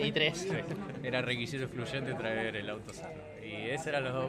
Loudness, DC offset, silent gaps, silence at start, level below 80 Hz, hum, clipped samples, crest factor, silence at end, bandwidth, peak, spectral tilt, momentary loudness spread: -35 LUFS; under 0.1%; none; 0 s; -62 dBFS; none; under 0.1%; 22 dB; 0 s; 14.5 kHz; -14 dBFS; -4.5 dB/octave; 13 LU